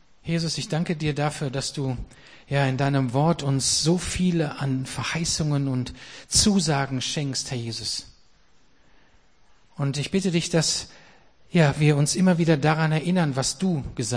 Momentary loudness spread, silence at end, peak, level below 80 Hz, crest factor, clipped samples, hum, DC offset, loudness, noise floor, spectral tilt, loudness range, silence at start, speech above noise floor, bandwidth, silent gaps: 9 LU; 0 s; -4 dBFS; -46 dBFS; 20 dB; under 0.1%; none; 0.2%; -24 LUFS; -60 dBFS; -4.5 dB/octave; 6 LU; 0.25 s; 37 dB; 10.5 kHz; none